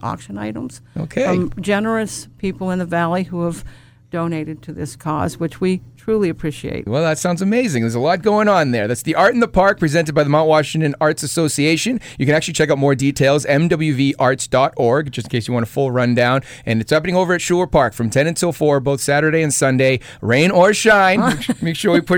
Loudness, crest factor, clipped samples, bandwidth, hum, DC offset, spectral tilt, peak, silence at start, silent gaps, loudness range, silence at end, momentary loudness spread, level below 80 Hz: -17 LUFS; 14 dB; under 0.1%; 19 kHz; none; under 0.1%; -5 dB/octave; -2 dBFS; 0 s; none; 8 LU; 0 s; 11 LU; -44 dBFS